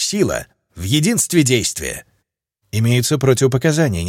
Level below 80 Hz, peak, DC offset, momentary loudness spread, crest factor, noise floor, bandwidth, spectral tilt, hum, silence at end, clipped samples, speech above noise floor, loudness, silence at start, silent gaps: -42 dBFS; -2 dBFS; under 0.1%; 12 LU; 16 dB; -71 dBFS; 17 kHz; -4.5 dB/octave; none; 0 s; under 0.1%; 55 dB; -17 LUFS; 0 s; none